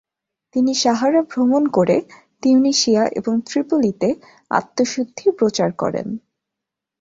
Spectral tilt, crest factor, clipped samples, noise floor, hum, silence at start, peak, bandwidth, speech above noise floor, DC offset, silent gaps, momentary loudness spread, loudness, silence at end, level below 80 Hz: -4.5 dB/octave; 16 dB; under 0.1%; -84 dBFS; none; 0.55 s; -2 dBFS; 7.8 kHz; 66 dB; under 0.1%; none; 8 LU; -18 LUFS; 0.85 s; -60 dBFS